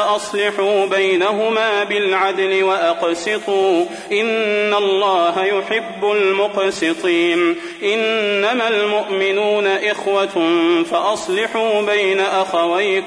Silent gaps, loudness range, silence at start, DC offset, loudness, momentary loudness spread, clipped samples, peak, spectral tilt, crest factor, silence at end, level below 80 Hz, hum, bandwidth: none; 1 LU; 0 s; under 0.1%; -17 LUFS; 4 LU; under 0.1%; -4 dBFS; -3.5 dB/octave; 12 dB; 0 s; -64 dBFS; none; 10.5 kHz